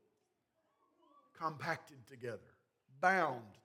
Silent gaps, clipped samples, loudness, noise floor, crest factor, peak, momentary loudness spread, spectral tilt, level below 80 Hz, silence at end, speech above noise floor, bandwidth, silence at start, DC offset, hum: none; under 0.1%; -38 LUFS; -82 dBFS; 24 dB; -18 dBFS; 17 LU; -5 dB/octave; under -90 dBFS; 0.1 s; 44 dB; 16 kHz; 1.35 s; under 0.1%; none